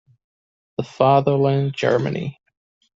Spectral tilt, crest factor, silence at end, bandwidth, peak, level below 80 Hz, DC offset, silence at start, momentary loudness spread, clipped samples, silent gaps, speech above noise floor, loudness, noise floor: -7.5 dB/octave; 18 dB; 0.65 s; 7.6 kHz; -2 dBFS; -60 dBFS; under 0.1%; 0.8 s; 15 LU; under 0.1%; none; over 71 dB; -19 LUFS; under -90 dBFS